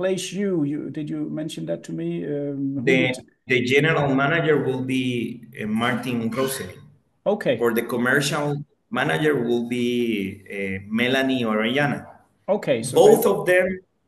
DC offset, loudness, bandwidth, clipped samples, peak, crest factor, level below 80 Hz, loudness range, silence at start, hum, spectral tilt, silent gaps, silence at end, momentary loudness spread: under 0.1%; -22 LUFS; 13 kHz; under 0.1%; -2 dBFS; 20 dB; -62 dBFS; 4 LU; 0 s; none; -5 dB/octave; none; 0.3 s; 11 LU